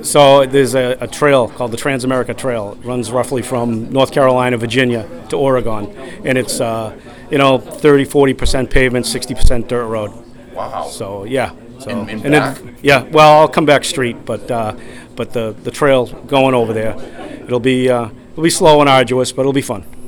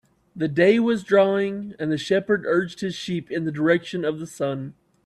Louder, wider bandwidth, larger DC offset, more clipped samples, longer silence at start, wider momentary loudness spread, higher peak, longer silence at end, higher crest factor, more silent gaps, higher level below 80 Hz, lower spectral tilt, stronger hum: first, -14 LUFS vs -23 LUFS; first, 19 kHz vs 12 kHz; neither; first, 0.5% vs under 0.1%; second, 0 s vs 0.35 s; first, 15 LU vs 11 LU; first, 0 dBFS vs -6 dBFS; second, 0 s vs 0.35 s; about the same, 14 dB vs 18 dB; neither; first, -26 dBFS vs -64 dBFS; about the same, -5 dB/octave vs -6 dB/octave; neither